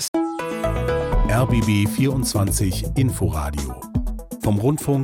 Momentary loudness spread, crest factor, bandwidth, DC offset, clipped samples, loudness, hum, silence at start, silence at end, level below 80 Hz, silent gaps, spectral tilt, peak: 8 LU; 12 dB; 17.5 kHz; under 0.1%; under 0.1%; -22 LUFS; none; 0 s; 0 s; -28 dBFS; 0.08-0.13 s; -6 dB/octave; -8 dBFS